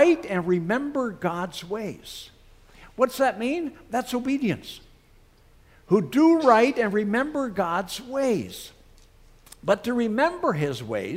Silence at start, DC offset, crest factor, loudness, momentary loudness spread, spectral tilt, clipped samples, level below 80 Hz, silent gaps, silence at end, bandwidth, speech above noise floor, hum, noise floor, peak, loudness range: 0 s; under 0.1%; 20 dB; -24 LUFS; 16 LU; -6 dB/octave; under 0.1%; -56 dBFS; none; 0 s; 16 kHz; 32 dB; none; -55 dBFS; -4 dBFS; 6 LU